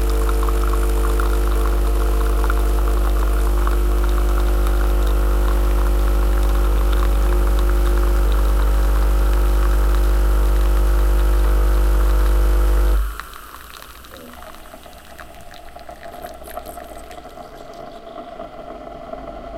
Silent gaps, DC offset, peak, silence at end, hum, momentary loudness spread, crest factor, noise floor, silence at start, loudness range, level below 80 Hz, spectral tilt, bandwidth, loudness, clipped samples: none; under 0.1%; -4 dBFS; 0 s; none; 18 LU; 12 dB; -38 dBFS; 0 s; 17 LU; -18 dBFS; -6 dB/octave; 16 kHz; -20 LUFS; under 0.1%